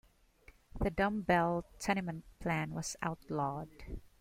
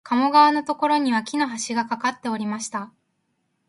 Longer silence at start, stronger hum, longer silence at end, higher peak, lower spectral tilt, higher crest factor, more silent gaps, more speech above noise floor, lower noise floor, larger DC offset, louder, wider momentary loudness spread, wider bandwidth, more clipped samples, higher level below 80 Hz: first, 0.75 s vs 0.05 s; neither; second, 0.15 s vs 0.8 s; second, -16 dBFS vs -4 dBFS; first, -5.5 dB/octave vs -3 dB/octave; about the same, 20 dB vs 18 dB; neither; second, 27 dB vs 51 dB; second, -63 dBFS vs -72 dBFS; neither; second, -36 LUFS vs -21 LUFS; first, 16 LU vs 13 LU; first, 16.5 kHz vs 11.5 kHz; neither; first, -52 dBFS vs -74 dBFS